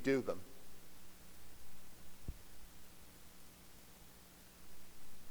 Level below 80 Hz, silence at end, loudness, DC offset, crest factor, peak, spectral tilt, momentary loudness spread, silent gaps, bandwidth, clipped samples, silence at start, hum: -62 dBFS; 0 s; -51 LUFS; under 0.1%; 22 dB; -22 dBFS; -5 dB/octave; 12 LU; none; over 20 kHz; under 0.1%; 0 s; 60 Hz at -70 dBFS